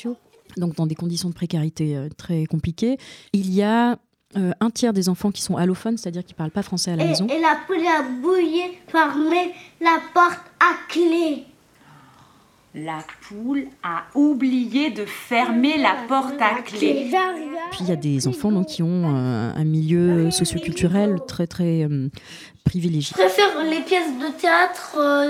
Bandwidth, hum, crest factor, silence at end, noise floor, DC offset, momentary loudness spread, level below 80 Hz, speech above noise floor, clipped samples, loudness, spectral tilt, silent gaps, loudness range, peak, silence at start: 16 kHz; none; 18 dB; 0 s; -54 dBFS; under 0.1%; 11 LU; -52 dBFS; 33 dB; under 0.1%; -21 LUFS; -5.5 dB/octave; none; 4 LU; -2 dBFS; 0 s